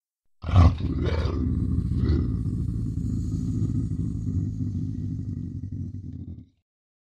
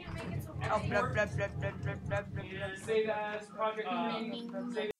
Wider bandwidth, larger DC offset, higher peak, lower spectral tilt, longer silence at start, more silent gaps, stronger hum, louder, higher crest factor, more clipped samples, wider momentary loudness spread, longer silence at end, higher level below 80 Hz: second, 7.4 kHz vs 14.5 kHz; neither; first, -6 dBFS vs -16 dBFS; first, -9 dB/octave vs -6 dB/octave; first, 0.4 s vs 0 s; neither; neither; first, -27 LUFS vs -36 LUFS; about the same, 20 dB vs 18 dB; neither; first, 14 LU vs 8 LU; first, 0.55 s vs 0.1 s; first, -32 dBFS vs -56 dBFS